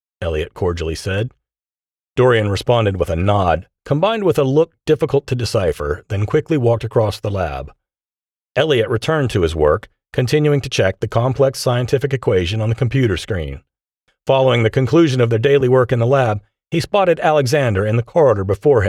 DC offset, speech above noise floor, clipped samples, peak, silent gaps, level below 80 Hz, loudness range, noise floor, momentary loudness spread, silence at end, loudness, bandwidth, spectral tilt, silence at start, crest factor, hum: under 0.1%; over 74 dB; under 0.1%; -4 dBFS; none; -38 dBFS; 4 LU; under -90 dBFS; 9 LU; 0 s; -17 LUFS; 14 kHz; -6.5 dB/octave; 0.2 s; 14 dB; none